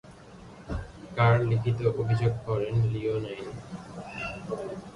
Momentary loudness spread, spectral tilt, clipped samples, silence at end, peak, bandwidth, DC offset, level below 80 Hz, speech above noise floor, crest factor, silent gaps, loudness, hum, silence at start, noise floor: 17 LU; -8 dB/octave; under 0.1%; 0 s; -10 dBFS; 10.5 kHz; under 0.1%; -48 dBFS; 21 dB; 18 dB; none; -28 LUFS; none; 0.05 s; -48 dBFS